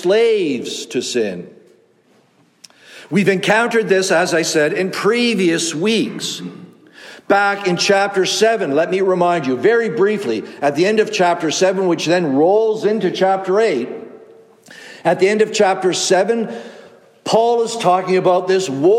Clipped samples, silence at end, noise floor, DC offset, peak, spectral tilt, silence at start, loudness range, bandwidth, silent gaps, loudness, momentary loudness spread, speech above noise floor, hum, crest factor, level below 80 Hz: under 0.1%; 0 s; -55 dBFS; under 0.1%; -2 dBFS; -4 dB/octave; 0 s; 3 LU; 14 kHz; none; -16 LUFS; 8 LU; 39 dB; none; 14 dB; -70 dBFS